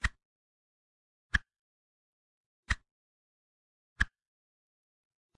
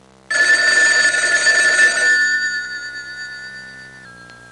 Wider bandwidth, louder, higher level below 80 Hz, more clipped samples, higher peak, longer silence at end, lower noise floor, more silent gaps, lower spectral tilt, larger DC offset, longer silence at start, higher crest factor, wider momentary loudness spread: second, 10.5 kHz vs 12 kHz; second, -35 LUFS vs -13 LUFS; first, -46 dBFS vs -60 dBFS; neither; second, -12 dBFS vs -4 dBFS; first, 1.3 s vs 0.15 s; first, under -90 dBFS vs -40 dBFS; first, 0.25-1.30 s, 1.59-2.63 s, 2.91-3.96 s vs none; first, -3 dB/octave vs 1 dB/octave; neither; second, 0.05 s vs 0.3 s; first, 30 dB vs 14 dB; second, 3 LU vs 19 LU